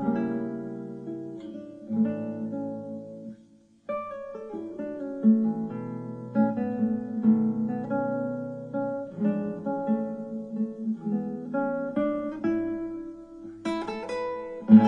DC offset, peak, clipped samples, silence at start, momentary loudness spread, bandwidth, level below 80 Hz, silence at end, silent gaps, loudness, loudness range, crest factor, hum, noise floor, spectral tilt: under 0.1%; -4 dBFS; under 0.1%; 0 s; 14 LU; 5.8 kHz; -66 dBFS; 0 s; none; -29 LUFS; 7 LU; 24 dB; none; -57 dBFS; -9 dB/octave